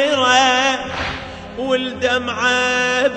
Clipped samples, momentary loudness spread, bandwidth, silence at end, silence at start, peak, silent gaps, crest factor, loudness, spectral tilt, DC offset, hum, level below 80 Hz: under 0.1%; 13 LU; 9.6 kHz; 0 s; 0 s; -2 dBFS; none; 16 dB; -16 LUFS; -2.5 dB/octave; under 0.1%; none; -46 dBFS